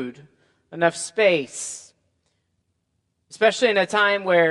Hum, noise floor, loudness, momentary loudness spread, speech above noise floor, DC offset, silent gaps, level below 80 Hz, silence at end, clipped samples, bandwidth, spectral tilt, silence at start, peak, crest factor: none; -73 dBFS; -20 LUFS; 15 LU; 53 dB; under 0.1%; none; -74 dBFS; 0 s; under 0.1%; 11.5 kHz; -3 dB/octave; 0 s; -2 dBFS; 20 dB